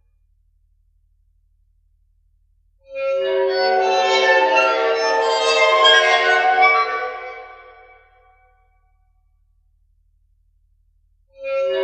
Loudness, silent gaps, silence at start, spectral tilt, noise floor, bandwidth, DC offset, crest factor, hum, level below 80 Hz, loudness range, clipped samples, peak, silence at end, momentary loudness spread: -16 LUFS; none; 2.9 s; 0 dB/octave; -60 dBFS; 8.8 kHz; under 0.1%; 20 dB; none; -60 dBFS; 16 LU; under 0.1%; 0 dBFS; 0 s; 16 LU